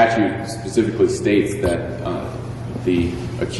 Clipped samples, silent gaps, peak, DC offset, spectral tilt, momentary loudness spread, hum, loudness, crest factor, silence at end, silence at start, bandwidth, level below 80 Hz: under 0.1%; none; -2 dBFS; under 0.1%; -6 dB/octave; 10 LU; none; -21 LUFS; 18 dB; 0 s; 0 s; 11.5 kHz; -40 dBFS